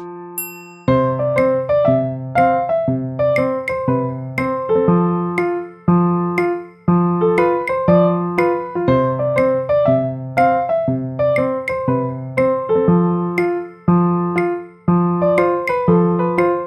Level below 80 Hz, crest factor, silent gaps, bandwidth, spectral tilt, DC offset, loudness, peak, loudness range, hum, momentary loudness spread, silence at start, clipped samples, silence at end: -48 dBFS; 14 dB; none; 13 kHz; -8.5 dB/octave; under 0.1%; -17 LUFS; -2 dBFS; 2 LU; none; 6 LU; 0 s; under 0.1%; 0 s